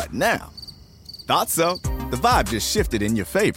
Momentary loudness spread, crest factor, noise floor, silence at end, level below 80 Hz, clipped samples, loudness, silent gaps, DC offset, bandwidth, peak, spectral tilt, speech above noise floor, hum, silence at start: 19 LU; 16 dB; -43 dBFS; 0 s; -34 dBFS; under 0.1%; -21 LUFS; none; under 0.1%; 17 kHz; -6 dBFS; -4 dB/octave; 22 dB; none; 0 s